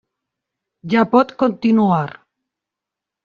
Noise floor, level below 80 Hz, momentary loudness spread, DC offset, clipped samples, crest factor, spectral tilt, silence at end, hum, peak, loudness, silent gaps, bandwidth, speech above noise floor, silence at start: -85 dBFS; -62 dBFS; 11 LU; under 0.1%; under 0.1%; 16 dB; -8.5 dB/octave; 1.2 s; none; -2 dBFS; -16 LUFS; none; 6.8 kHz; 69 dB; 0.85 s